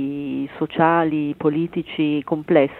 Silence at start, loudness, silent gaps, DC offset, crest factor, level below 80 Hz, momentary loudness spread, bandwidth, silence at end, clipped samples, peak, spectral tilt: 0 s; -21 LUFS; none; under 0.1%; 18 dB; -58 dBFS; 8 LU; 4.2 kHz; 0 s; under 0.1%; -2 dBFS; -9.5 dB/octave